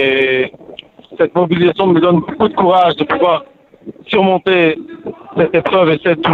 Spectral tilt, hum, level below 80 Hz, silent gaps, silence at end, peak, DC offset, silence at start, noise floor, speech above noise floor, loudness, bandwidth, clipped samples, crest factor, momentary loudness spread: -8.5 dB/octave; none; -50 dBFS; none; 0 s; -2 dBFS; under 0.1%; 0 s; -36 dBFS; 24 dB; -13 LUFS; 4.8 kHz; under 0.1%; 12 dB; 11 LU